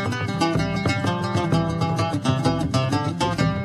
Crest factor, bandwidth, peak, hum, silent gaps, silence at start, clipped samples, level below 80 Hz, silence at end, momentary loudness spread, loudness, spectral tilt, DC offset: 16 dB; 13 kHz; -6 dBFS; none; none; 0 s; under 0.1%; -42 dBFS; 0 s; 2 LU; -23 LUFS; -6 dB/octave; under 0.1%